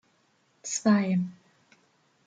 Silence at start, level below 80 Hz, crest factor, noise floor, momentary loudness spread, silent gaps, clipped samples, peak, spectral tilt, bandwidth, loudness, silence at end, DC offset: 0.65 s; -74 dBFS; 20 dB; -68 dBFS; 14 LU; none; under 0.1%; -10 dBFS; -5.5 dB/octave; 9.4 kHz; -27 LUFS; 0.95 s; under 0.1%